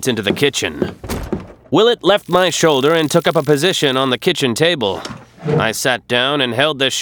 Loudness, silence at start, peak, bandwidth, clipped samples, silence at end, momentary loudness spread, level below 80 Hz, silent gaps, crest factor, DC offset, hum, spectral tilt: -15 LUFS; 0 s; 0 dBFS; over 20 kHz; under 0.1%; 0 s; 11 LU; -42 dBFS; none; 16 dB; under 0.1%; none; -4 dB/octave